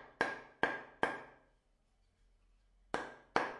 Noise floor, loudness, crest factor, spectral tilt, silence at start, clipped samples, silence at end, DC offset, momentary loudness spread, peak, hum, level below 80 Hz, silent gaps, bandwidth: -74 dBFS; -40 LUFS; 28 dB; -4 dB/octave; 0 s; under 0.1%; 0 s; under 0.1%; 7 LU; -14 dBFS; none; -70 dBFS; none; 11.5 kHz